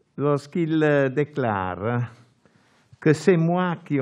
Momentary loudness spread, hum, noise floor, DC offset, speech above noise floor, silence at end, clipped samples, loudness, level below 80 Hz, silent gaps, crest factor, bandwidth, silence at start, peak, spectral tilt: 7 LU; none; -59 dBFS; under 0.1%; 38 dB; 0 s; under 0.1%; -23 LUFS; -66 dBFS; none; 20 dB; 11 kHz; 0.15 s; -4 dBFS; -7.5 dB/octave